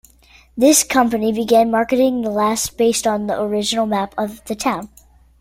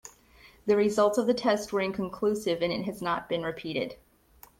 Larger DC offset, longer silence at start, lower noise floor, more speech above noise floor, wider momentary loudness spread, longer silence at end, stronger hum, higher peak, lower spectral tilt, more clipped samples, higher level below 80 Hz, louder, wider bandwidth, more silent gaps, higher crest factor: neither; first, 0.55 s vs 0.05 s; second, -49 dBFS vs -57 dBFS; about the same, 32 dB vs 29 dB; about the same, 10 LU vs 9 LU; about the same, 0.55 s vs 0.65 s; neither; first, 0 dBFS vs -12 dBFS; second, -3 dB/octave vs -5 dB/octave; neither; first, -50 dBFS vs -62 dBFS; first, -17 LUFS vs -28 LUFS; about the same, 16.5 kHz vs 16.5 kHz; neither; about the same, 18 dB vs 16 dB